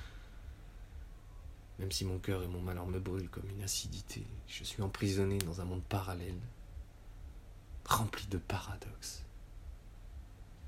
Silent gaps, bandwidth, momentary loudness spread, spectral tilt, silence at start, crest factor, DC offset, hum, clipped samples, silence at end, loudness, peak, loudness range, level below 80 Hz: none; 16 kHz; 20 LU; -4.5 dB/octave; 0 s; 30 dB; under 0.1%; none; under 0.1%; 0 s; -39 LUFS; -12 dBFS; 3 LU; -50 dBFS